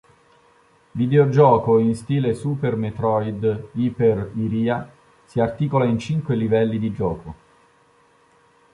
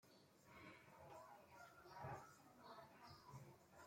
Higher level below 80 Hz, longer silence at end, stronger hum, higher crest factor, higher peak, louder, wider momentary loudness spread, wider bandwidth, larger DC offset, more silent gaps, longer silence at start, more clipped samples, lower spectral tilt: first, -50 dBFS vs -84 dBFS; first, 1.4 s vs 0 s; neither; about the same, 18 dB vs 18 dB; first, -2 dBFS vs -44 dBFS; first, -21 LUFS vs -62 LUFS; about the same, 11 LU vs 9 LU; second, 11.5 kHz vs 16.5 kHz; neither; neither; first, 0.95 s vs 0 s; neither; first, -8.5 dB/octave vs -5 dB/octave